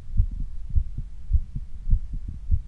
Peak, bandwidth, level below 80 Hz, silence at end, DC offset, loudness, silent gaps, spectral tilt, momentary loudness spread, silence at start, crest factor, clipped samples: -6 dBFS; 0.5 kHz; -26 dBFS; 0 s; under 0.1%; -31 LUFS; none; -9.5 dB/octave; 9 LU; 0 s; 18 dB; under 0.1%